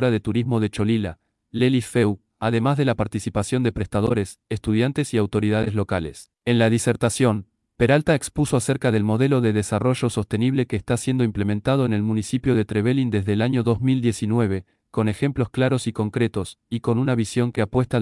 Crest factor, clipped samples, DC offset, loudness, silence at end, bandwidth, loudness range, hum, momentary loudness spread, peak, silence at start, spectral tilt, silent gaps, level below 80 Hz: 16 dB; under 0.1%; under 0.1%; -22 LUFS; 0 s; 12 kHz; 2 LU; none; 6 LU; -6 dBFS; 0 s; -6.5 dB/octave; none; -48 dBFS